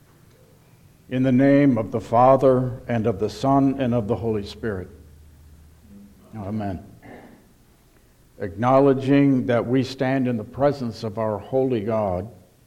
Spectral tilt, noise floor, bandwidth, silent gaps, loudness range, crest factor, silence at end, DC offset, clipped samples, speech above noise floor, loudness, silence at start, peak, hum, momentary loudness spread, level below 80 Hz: -8.5 dB/octave; -55 dBFS; 9.6 kHz; none; 16 LU; 18 dB; 0.35 s; under 0.1%; under 0.1%; 35 dB; -21 LUFS; 1.1 s; -4 dBFS; none; 15 LU; -52 dBFS